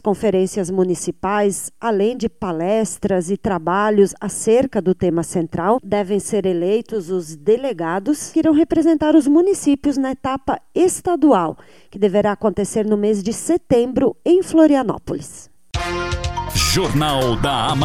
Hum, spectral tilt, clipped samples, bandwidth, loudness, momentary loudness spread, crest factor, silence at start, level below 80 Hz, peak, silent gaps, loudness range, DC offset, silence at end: none; -5 dB/octave; under 0.1%; 16 kHz; -18 LUFS; 8 LU; 16 dB; 0.05 s; -38 dBFS; -2 dBFS; none; 3 LU; 0.4%; 0 s